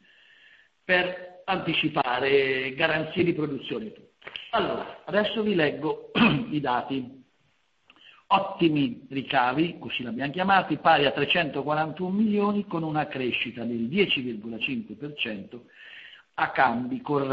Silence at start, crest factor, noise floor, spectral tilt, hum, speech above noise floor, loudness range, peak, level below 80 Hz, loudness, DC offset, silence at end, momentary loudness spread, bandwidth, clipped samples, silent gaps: 0.9 s; 22 dB; -69 dBFS; -8 dB/octave; none; 43 dB; 4 LU; -6 dBFS; -62 dBFS; -26 LUFS; under 0.1%; 0 s; 14 LU; 5.4 kHz; under 0.1%; none